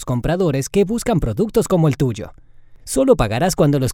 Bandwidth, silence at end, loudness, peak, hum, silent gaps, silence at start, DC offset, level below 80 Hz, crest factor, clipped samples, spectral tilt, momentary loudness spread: 17 kHz; 0 s; -18 LUFS; 0 dBFS; none; none; 0 s; under 0.1%; -34 dBFS; 16 dB; under 0.1%; -6 dB/octave; 6 LU